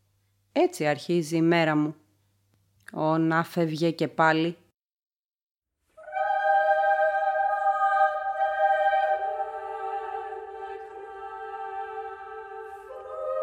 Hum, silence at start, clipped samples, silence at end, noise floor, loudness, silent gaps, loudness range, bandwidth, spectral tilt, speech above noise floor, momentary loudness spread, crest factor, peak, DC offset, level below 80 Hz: none; 0.55 s; under 0.1%; 0 s; -69 dBFS; -26 LUFS; 5.06-5.10 s, 5.19-5.48 s; 12 LU; 16.5 kHz; -6 dB/octave; 45 dB; 17 LU; 20 dB; -6 dBFS; under 0.1%; -70 dBFS